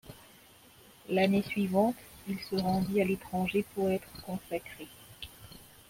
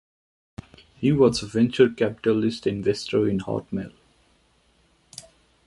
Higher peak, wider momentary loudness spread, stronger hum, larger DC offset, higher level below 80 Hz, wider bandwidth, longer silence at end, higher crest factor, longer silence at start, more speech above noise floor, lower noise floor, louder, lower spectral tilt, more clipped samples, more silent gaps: second, -14 dBFS vs -4 dBFS; second, 21 LU vs 24 LU; neither; neither; second, -60 dBFS vs -54 dBFS; first, 16.5 kHz vs 11.5 kHz; second, 0.25 s vs 1.8 s; about the same, 18 dB vs 20 dB; second, 0.05 s vs 1 s; second, 27 dB vs 41 dB; second, -57 dBFS vs -63 dBFS; second, -32 LUFS vs -23 LUFS; about the same, -6.5 dB/octave vs -6.5 dB/octave; neither; neither